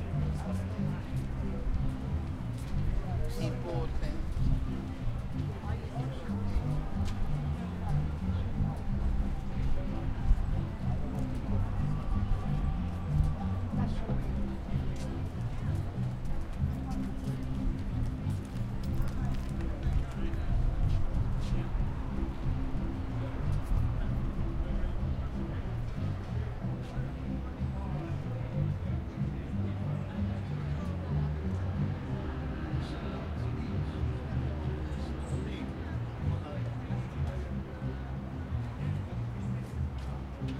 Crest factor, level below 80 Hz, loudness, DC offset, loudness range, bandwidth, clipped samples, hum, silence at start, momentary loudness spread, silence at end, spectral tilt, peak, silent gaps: 18 dB; -36 dBFS; -35 LUFS; under 0.1%; 3 LU; 11.5 kHz; under 0.1%; none; 0 s; 4 LU; 0 s; -8 dB/octave; -14 dBFS; none